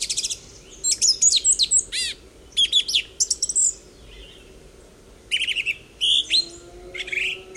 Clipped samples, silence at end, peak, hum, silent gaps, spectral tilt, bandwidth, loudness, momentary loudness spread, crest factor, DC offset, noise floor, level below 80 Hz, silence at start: under 0.1%; 0 s; -6 dBFS; none; none; 2.5 dB/octave; 16 kHz; -19 LUFS; 13 LU; 18 dB; under 0.1%; -48 dBFS; -50 dBFS; 0 s